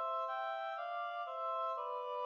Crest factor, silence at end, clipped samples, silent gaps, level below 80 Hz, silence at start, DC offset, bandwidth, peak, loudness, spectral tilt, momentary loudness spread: 10 dB; 0 s; under 0.1%; none; under -90 dBFS; 0 s; under 0.1%; 7 kHz; -30 dBFS; -40 LUFS; 0.5 dB/octave; 3 LU